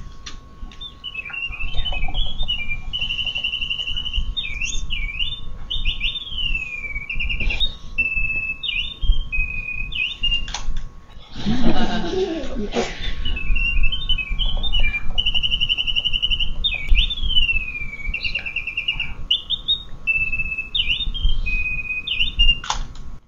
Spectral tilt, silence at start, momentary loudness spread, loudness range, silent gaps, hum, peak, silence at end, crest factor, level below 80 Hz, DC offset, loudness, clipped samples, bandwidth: -3.5 dB/octave; 0 s; 9 LU; 4 LU; none; none; 0 dBFS; 0.1 s; 18 dB; -24 dBFS; under 0.1%; -22 LUFS; under 0.1%; 7.4 kHz